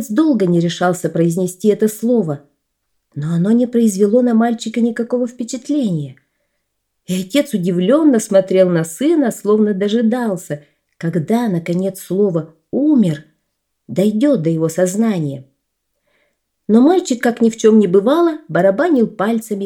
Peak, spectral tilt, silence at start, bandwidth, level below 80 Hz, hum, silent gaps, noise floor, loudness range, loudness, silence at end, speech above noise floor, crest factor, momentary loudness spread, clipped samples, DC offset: 0 dBFS; -6.5 dB/octave; 0 s; 17 kHz; -66 dBFS; none; none; -72 dBFS; 4 LU; -15 LUFS; 0 s; 57 dB; 14 dB; 11 LU; under 0.1%; under 0.1%